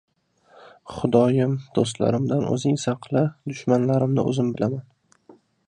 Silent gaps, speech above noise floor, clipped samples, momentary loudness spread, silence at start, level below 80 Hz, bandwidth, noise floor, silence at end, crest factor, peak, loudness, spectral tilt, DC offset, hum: none; 35 dB; under 0.1%; 7 LU; 0.85 s; -58 dBFS; 10 kHz; -57 dBFS; 0.35 s; 20 dB; -4 dBFS; -23 LUFS; -7 dB/octave; under 0.1%; none